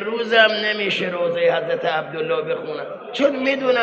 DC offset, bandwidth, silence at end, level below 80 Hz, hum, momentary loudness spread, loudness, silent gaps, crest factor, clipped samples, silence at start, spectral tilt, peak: under 0.1%; 7.8 kHz; 0 s; -68 dBFS; none; 11 LU; -20 LUFS; none; 20 dB; under 0.1%; 0 s; -4.5 dB/octave; 0 dBFS